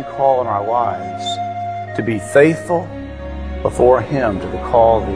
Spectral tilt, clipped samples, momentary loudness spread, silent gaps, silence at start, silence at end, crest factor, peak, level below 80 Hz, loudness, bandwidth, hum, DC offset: -6.5 dB/octave; under 0.1%; 13 LU; none; 0 s; 0 s; 16 dB; 0 dBFS; -34 dBFS; -17 LUFS; 11 kHz; none; 0.3%